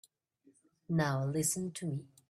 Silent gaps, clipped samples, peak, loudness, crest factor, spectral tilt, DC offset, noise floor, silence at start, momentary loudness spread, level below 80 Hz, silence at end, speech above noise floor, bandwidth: none; under 0.1%; -18 dBFS; -34 LUFS; 18 dB; -5 dB/octave; under 0.1%; -70 dBFS; 0.9 s; 7 LU; -70 dBFS; 0.25 s; 36 dB; 14.5 kHz